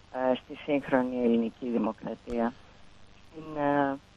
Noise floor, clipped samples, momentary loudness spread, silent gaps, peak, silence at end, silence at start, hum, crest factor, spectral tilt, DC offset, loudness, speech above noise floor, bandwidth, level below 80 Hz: -52 dBFS; under 0.1%; 12 LU; none; -10 dBFS; 0.2 s; 0.1 s; 50 Hz at -60 dBFS; 20 dB; -7.5 dB/octave; under 0.1%; -30 LUFS; 23 dB; 7.6 kHz; -58 dBFS